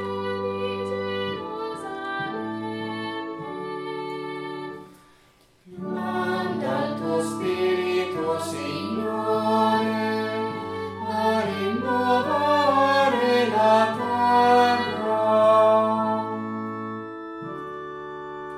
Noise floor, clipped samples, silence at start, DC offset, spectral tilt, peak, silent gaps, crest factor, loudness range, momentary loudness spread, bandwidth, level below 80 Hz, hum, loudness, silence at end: -58 dBFS; under 0.1%; 0 s; under 0.1%; -5.5 dB/octave; -6 dBFS; none; 18 dB; 12 LU; 15 LU; 15.5 kHz; -68 dBFS; none; -24 LUFS; 0 s